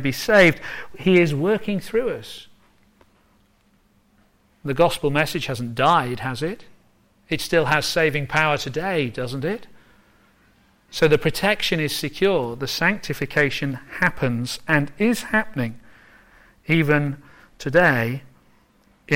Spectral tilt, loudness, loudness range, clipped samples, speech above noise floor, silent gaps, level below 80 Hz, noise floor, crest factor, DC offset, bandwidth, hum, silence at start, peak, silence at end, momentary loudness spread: -5 dB/octave; -21 LUFS; 4 LU; under 0.1%; 39 dB; none; -48 dBFS; -60 dBFS; 18 dB; under 0.1%; 16.5 kHz; none; 0 s; -4 dBFS; 0 s; 12 LU